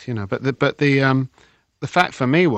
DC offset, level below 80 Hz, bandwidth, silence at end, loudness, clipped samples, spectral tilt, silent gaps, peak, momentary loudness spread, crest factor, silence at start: under 0.1%; -58 dBFS; 8.6 kHz; 0 s; -19 LUFS; under 0.1%; -7 dB/octave; none; -2 dBFS; 10 LU; 18 dB; 0 s